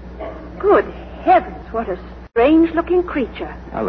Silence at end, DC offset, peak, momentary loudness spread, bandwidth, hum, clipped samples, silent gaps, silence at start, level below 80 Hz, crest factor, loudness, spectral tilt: 0 s; under 0.1%; -2 dBFS; 16 LU; 5.4 kHz; none; under 0.1%; none; 0 s; -36 dBFS; 16 dB; -17 LUFS; -9 dB/octave